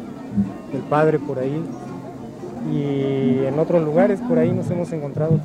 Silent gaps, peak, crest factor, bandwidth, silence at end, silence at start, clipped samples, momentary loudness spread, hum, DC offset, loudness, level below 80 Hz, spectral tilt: none; -4 dBFS; 16 dB; 10 kHz; 0 s; 0 s; under 0.1%; 14 LU; none; under 0.1%; -21 LUFS; -52 dBFS; -9 dB/octave